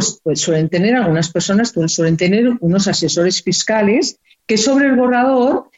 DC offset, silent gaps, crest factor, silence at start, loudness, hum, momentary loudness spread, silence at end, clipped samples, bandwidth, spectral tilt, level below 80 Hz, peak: under 0.1%; none; 12 dB; 0 s; -15 LUFS; none; 4 LU; 0.15 s; under 0.1%; 8.2 kHz; -4.5 dB/octave; -52 dBFS; -2 dBFS